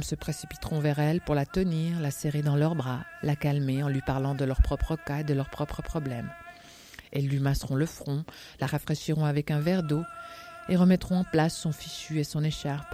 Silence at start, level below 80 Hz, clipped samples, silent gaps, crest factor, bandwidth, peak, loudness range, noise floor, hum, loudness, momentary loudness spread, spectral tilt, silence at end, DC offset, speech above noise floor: 0 s; -40 dBFS; under 0.1%; none; 20 dB; 15.5 kHz; -10 dBFS; 4 LU; -49 dBFS; none; -29 LUFS; 10 LU; -6.5 dB/octave; 0 s; under 0.1%; 22 dB